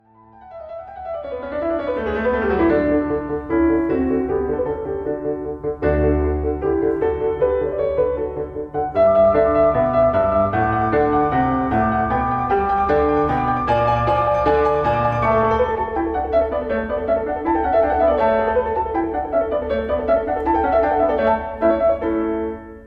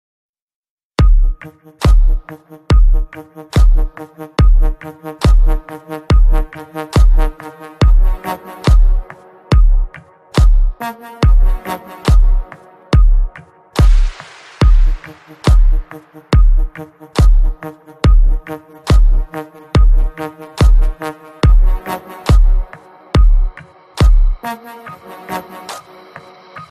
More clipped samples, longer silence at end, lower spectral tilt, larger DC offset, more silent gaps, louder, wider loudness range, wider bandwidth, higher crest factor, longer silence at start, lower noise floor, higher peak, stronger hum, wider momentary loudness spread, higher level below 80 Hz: neither; about the same, 0 s vs 0.05 s; first, -9 dB/octave vs -7 dB/octave; neither; neither; second, -19 LUFS vs -16 LUFS; first, 4 LU vs 1 LU; second, 6.4 kHz vs 10 kHz; about the same, 12 dB vs 10 dB; second, 0.4 s vs 1 s; first, -46 dBFS vs -38 dBFS; second, -6 dBFS vs 0 dBFS; neither; second, 8 LU vs 19 LU; second, -36 dBFS vs -12 dBFS